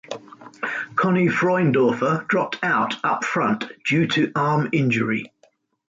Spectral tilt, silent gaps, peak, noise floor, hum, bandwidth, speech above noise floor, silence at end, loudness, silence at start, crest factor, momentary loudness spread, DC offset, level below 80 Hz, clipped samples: -6.5 dB/octave; none; -8 dBFS; -61 dBFS; none; 8 kHz; 40 dB; 0.6 s; -21 LUFS; 0.1 s; 14 dB; 9 LU; under 0.1%; -62 dBFS; under 0.1%